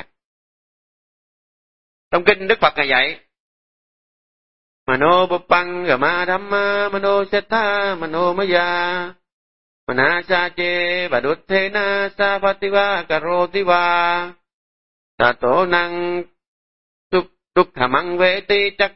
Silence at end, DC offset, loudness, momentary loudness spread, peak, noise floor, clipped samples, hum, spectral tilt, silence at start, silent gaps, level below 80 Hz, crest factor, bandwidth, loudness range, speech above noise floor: 0 s; 1%; -18 LUFS; 7 LU; 0 dBFS; under -90 dBFS; under 0.1%; none; -7.5 dB/octave; 0 s; 0.25-2.11 s, 3.40-4.86 s, 9.32-9.87 s, 14.53-15.18 s, 16.48-17.10 s; -52 dBFS; 20 dB; 5.8 kHz; 2 LU; over 72 dB